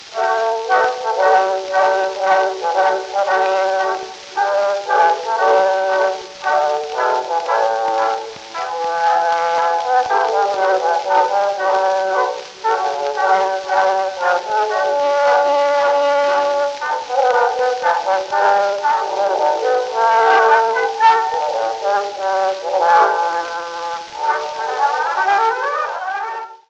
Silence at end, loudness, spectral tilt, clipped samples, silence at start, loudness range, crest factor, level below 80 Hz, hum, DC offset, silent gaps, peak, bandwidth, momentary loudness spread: 0.15 s; -17 LUFS; -1.5 dB/octave; under 0.1%; 0 s; 3 LU; 16 dB; -66 dBFS; none; under 0.1%; none; -2 dBFS; 8.6 kHz; 7 LU